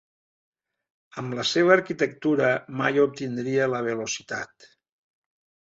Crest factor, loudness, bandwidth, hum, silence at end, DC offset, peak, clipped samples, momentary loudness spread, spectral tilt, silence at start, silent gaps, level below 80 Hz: 22 dB; -24 LUFS; 8 kHz; none; 1.2 s; under 0.1%; -4 dBFS; under 0.1%; 14 LU; -4.5 dB/octave; 1.15 s; none; -70 dBFS